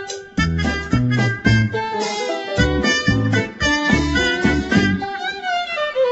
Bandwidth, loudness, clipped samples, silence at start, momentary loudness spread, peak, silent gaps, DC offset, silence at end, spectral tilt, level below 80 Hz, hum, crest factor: 8.2 kHz; -19 LUFS; under 0.1%; 0 s; 6 LU; -2 dBFS; none; under 0.1%; 0 s; -5 dB/octave; -32 dBFS; none; 16 dB